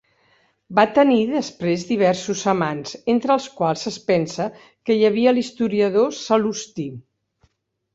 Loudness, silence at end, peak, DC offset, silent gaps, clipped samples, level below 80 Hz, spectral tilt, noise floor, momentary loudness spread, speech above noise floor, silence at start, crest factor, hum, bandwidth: -20 LUFS; 0.95 s; -2 dBFS; under 0.1%; none; under 0.1%; -62 dBFS; -5.5 dB/octave; -65 dBFS; 11 LU; 45 dB; 0.7 s; 18 dB; none; 8 kHz